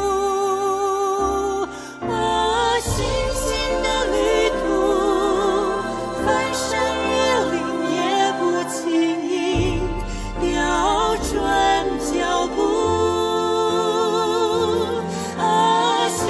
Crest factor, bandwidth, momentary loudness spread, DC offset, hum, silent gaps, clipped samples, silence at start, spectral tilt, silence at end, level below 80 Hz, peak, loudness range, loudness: 14 dB; 11 kHz; 5 LU; under 0.1%; none; none; under 0.1%; 0 s; -4 dB/octave; 0 s; -36 dBFS; -6 dBFS; 2 LU; -20 LUFS